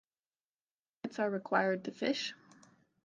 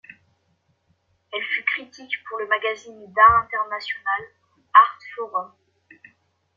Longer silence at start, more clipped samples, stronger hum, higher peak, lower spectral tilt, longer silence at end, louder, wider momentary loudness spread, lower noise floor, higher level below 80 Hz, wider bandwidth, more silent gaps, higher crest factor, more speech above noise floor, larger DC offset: second, 1.05 s vs 1.35 s; neither; neither; second, -14 dBFS vs -2 dBFS; about the same, -4.5 dB/octave vs -3.5 dB/octave; second, 0.7 s vs 1.1 s; second, -35 LUFS vs -21 LUFS; second, 11 LU vs 16 LU; first, under -90 dBFS vs -68 dBFS; second, -86 dBFS vs -56 dBFS; first, 9.6 kHz vs 7.2 kHz; neither; about the same, 24 dB vs 22 dB; first, over 56 dB vs 45 dB; neither